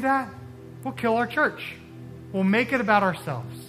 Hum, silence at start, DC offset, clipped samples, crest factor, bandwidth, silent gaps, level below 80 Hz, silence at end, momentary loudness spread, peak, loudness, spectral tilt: none; 0 s; under 0.1%; under 0.1%; 20 dB; 15 kHz; none; -62 dBFS; 0 s; 21 LU; -6 dBFS; -24 LUFS; -6.5 dB/octave